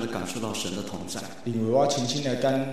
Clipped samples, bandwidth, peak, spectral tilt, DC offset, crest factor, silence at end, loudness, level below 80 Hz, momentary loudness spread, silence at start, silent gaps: under 0.1%; 13.5 kHz; -10 dBFS; -4.5 dB/octave; 0.8%; 16 dB; 0 s; -27 LUFS; -62 dBFS; 11 LU; 0 s; none